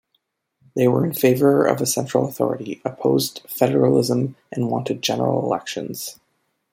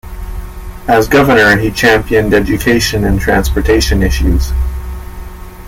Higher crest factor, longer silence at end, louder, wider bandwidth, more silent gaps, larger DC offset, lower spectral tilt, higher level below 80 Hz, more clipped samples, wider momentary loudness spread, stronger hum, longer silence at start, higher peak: first, 18 dB vs 12 dB; first, 0.6 s vs 0 s; second, -20 LUFS vs -11 LUFS; about the same, 16.5 kHz vs 17 kHz; neither; neither; about the same, -5.5 dB/octave vs -5 dB/octave; second, -64 dBFS vs -18 dBFS; neither; second, 12 LU vs 19 LU; neither; first, 0.75 s vs 0.05 s; about the same, -2 dBFS vs 0 dBFS